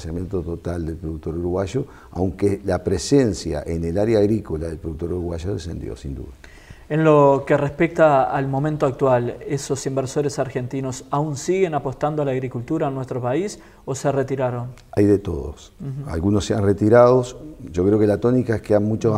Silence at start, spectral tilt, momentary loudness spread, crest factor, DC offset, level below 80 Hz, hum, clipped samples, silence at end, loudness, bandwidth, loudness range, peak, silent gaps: 0 s; -7 dB/octave; 14 LU; 18 dB; under 0.1%; -40 dBFS; none; under 0.1%; 0 s; -21 LUFS; 15 kHz; 5 LU; -2 dBFS; none